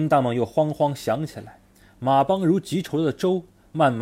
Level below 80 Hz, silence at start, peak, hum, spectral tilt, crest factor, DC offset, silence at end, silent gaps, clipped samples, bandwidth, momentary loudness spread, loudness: -58 dBFS; 0 s; -6 dBFS; none; -7 dB/octave; 16 dB; under 0.1%; 0 s; none; under 0.1%; 16 kHz; 9 LU; -23 LUFS